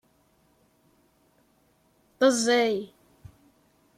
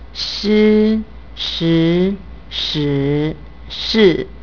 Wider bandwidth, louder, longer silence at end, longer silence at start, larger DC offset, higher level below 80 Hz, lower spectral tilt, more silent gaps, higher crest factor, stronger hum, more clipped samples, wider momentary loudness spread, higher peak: first, 15.5 kHz vs 5.4 kHz; second, -24 LUFS vs -16 LUFS; first, 1.1 s vs 0 s; first, 2.2 s vs 0 s; second, under 0.1% vs 1%; second, -70 dBFS vs -36 dBFS; second, -2.5 dB/octave vs -6.5 dB/octave; neither; about the same, 20 dB vs 16 dB; neither; neither; about the same, 13 LU vs 14 LU; second, -10 dBFS vs 0 dBFS